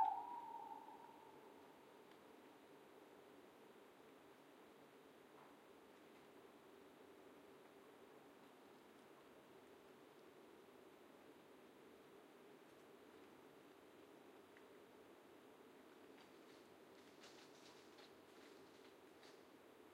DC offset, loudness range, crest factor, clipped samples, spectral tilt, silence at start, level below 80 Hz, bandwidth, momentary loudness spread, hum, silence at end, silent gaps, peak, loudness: under 0.1%; 2 LU; 30 dB; under 0.1%; -4 dB/octave; 0 s; under -90 dBFS; 16 kHz; 3 LU; none; 0 s; none; -28 dBFS; -62 LUFS